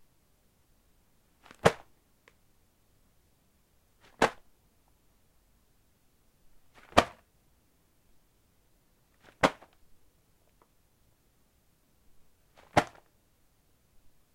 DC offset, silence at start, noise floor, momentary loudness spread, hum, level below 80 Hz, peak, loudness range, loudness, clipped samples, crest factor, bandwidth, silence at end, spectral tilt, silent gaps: under 0.1%; 1.65 s; -68 dBFS; 19 LU; none; -60 dBFS; -4 dBFS; 5 LU; -30 LUFS; under 0.1%; 34 dB; 16.5 kHz; 1.5 s; -4.5 dB/octave; none